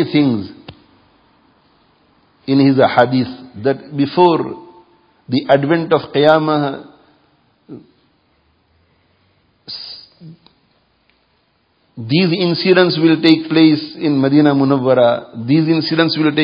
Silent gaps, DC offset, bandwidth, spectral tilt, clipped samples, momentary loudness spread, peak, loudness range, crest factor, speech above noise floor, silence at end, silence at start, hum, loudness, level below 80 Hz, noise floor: none; under 0.1%; 5.4 kHz; -9 dB/octave; under 0.1%; 16 LU; 0 dBFS; 23 LU; 16 dB; 47 dB; 0 s; 0 s; none; -14 LUFS; -58 dBFS; -60 dBFS